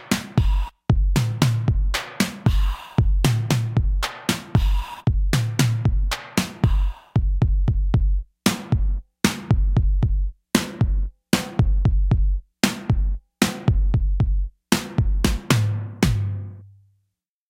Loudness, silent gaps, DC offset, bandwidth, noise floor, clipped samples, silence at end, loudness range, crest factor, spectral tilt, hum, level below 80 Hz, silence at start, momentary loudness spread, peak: -23 LUFS; none; under 0.1%; 16.5 kHz; -75 dBFS; under 0.1%; 0.85 s; 1 LU; 20 dB; -5.5 dB/octave; none; -24 dBFS; 0 s; 5 LU; -2 dBFS